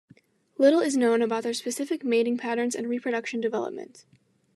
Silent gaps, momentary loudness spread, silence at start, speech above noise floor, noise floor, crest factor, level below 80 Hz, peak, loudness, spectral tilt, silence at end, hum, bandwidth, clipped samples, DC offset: none; 12 LU; 0.6 s; 33 dB; -59 dBFS; 18 dB; -88 dBFS; -8 dBFS; -26 LUFS; -3.5 dB/octave; 0.55 s; none; 13 kHz; under 0.1%; under 0.1%